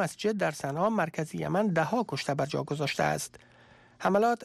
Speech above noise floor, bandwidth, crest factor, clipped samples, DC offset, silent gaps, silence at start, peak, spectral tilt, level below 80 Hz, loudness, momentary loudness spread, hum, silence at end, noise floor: 28 dB; 14 kHz; 14 dB; under 0.1%; under 0.1%; none; 0 s; -16 dBFS; -5.5 dB/octave; -66 dBFS; -29 LUFS; 6 LU; none; 0 s; -57 dBFS